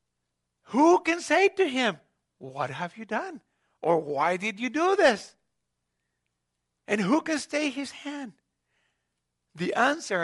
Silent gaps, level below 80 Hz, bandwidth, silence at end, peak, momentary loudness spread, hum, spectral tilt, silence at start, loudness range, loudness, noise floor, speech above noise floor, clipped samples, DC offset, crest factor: none; -76 dBFS; 11.5 kHz; 0 s; -8 dBFS; 15 LU; 60 Hz at -60 dBFS; -4 dB/octave; 0.7 s; 5 LU; -26 LUFS; -81 dBFS; 56 dB; under 0.1%; under 0.1%; 20 dB